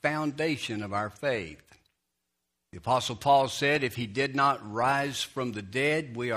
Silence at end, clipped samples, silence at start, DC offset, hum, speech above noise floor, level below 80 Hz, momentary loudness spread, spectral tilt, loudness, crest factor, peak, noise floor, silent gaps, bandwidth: 0 s; under 0.1%; 0.05 s; under 0.1%; none; 54 dB; -64 dBFS; 8 LU; -4.5 dB/octave; -28 LUFS; 18 dB; -12 dBFS; -82 dBFS; none; 15.5 kHz